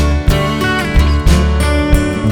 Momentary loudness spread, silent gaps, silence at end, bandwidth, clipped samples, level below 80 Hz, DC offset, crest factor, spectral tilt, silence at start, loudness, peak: 2 LU; none; 0 s; 17.5 kHz; under 0.1%; -14 dBFS; under 0.1%; 10 dB; -6 dB/octave; 0 s; -13 LUFS; -2 dBFS